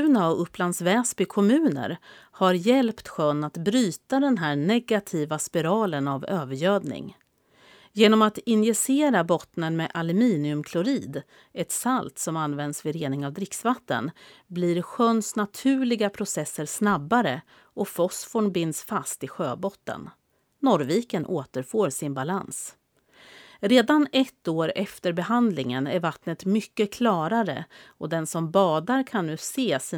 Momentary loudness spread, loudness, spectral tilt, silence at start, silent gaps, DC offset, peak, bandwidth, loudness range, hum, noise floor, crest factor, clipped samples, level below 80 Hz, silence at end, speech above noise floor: 10 LU; -25 LUFS; -5 dB/octave; 0 s; none; under 0.1%; -4 dBFS; 19.5 kHz; 5 LU; none; -59 dBFS; 20 dB; under 0.1%; -68 dBFS; 0 s; 34 dB